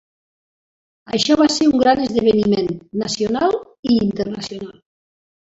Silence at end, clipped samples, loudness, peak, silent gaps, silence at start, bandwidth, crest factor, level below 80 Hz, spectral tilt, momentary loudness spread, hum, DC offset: 0.85 s; under 0.1%; -18 LUFS; -2 dBFS; 3.79-3.83 s; 1.1 s; 8 kHz; 16 dB; -50 dBFS; -5 dB/octave; 11 LU; none; under 0.1%